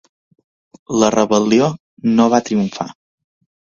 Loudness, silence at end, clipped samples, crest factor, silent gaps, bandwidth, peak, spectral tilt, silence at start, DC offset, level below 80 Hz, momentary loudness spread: -16 LUFS; 0.9 s; under 0.1%; 18 dB; 1.80-1.97 s; 7.4 kHz; 0 dBFS; -5.5 dB/octave; 0.9 s; under 0.1%; -56 dBFS; 9 LU